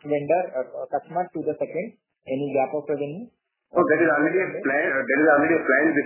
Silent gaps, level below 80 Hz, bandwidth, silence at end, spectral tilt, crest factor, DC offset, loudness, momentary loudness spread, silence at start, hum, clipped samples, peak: none; -70 dBFS; 3.2 kHz; 0 s; -10.5 dB/octave; 18 dB; under 0.1%; -23 LUFS; 12 LU; 0.05 s; none; under 0.1%; -6 dBFS